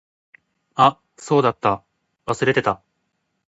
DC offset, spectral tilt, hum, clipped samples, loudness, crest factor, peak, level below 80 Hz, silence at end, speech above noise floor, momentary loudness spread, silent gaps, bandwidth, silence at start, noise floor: under 0.1%; -5.5 dB/octave; none; under 0.1%; -20 LUFS; 22 dB; 0 dBFS; -56 dBFS; 0.75 s; 54 dB; 14 LU; none; 8 kHz; 0.75 s; -73 dBFS